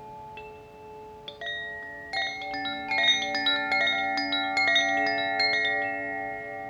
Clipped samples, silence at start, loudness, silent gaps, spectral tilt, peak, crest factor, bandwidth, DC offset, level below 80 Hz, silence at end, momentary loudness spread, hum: under 0.1%; 0 s; -25 LUFS; none; -1.5 dB/octave; -10 dBFS; 18 dB; 18 kHz; under 0.1%; -62 dBFS; 0 s; 20 LU; none